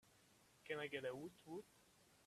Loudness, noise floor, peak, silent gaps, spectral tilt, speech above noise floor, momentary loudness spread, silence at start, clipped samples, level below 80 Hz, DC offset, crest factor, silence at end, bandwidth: -50 LUFS; -73 dBFS; -32 dBFS; none; -4.5 dB/octave; 23 dB; 15 LU; 0.05 s; under 0.1%; -86 dBFS; under 0.1%; 22 dB; 0.05 s; 14.5 kHz